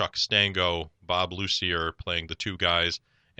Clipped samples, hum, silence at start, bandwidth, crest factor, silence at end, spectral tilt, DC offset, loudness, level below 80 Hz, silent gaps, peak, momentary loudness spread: under 0.1%; none; 0 s; 8.6 kHz; 22 dB; 0.4 s; -3.5 dB/octave; under 0.1%; -26 LUFS; -50 dBFS; none; -6 dBFS; 9 LU